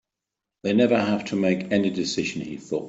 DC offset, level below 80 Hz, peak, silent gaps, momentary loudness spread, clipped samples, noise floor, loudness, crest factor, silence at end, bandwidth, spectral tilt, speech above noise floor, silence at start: under 0.1%; -62 dBFS; -8 dBFS; none; 10 LU; under 0.1%; -86 dBFS; -24 LUFS; 18 dB; 0 s; 8 kHz; -5.5 dB/octave; 63 dB; 0.65 s